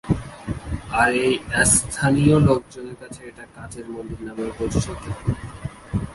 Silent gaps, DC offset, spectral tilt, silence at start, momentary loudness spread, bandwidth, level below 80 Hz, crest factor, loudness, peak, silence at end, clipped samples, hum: none; under 0.1%; -4.5 dB/octave; 0.05 s; 21 LU; 11.5 kHz; -38 dBFS; 20 dB; -21 LUFS; -2 dBFS; 0 s; under 0.1%; none